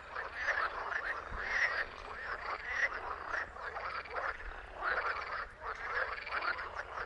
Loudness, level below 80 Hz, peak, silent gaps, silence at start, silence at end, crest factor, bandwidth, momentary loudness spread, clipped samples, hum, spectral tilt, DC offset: -37 LUFS; -56 dBFS; -20 dBFS; none; 0 s; 0 s; 20 dB; 11 kHz; 8 LU; under 0.1%; none; -3 dB/octave; under 0.1%